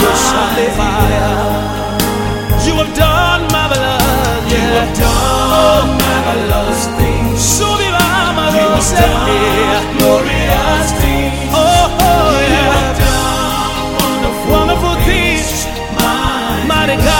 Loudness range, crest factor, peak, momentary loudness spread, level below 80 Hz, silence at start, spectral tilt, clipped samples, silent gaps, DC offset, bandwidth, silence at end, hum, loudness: 2 LU; 12 dB; 0 dBFS; 5 LU; -20 dBFS; 0 s; -4 dB/octave; under 0.1%; none; under 0.1%; 17 kHz; 0 s; none; -12 LUFS